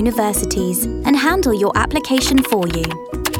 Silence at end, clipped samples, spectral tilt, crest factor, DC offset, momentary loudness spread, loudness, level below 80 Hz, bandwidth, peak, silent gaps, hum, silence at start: 0 s; under 0.1%; -4 dB/octave; 14 dB; under 0.1%; 6 LU; -17 LUFS; -30 dBFS; 19 kHz; -4 dBFS; none; none; 0 s